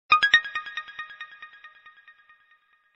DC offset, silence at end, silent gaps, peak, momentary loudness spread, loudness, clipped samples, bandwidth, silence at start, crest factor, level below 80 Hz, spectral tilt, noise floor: under 0.1%; 1.3 s; none; -2 dBFS; 26 LU; -22 LUFS; under 0.1%; 8.4 kHz; 0.1 s; 26 dB; -66 dBFS; 0.5 dB/octave; -63 dBFS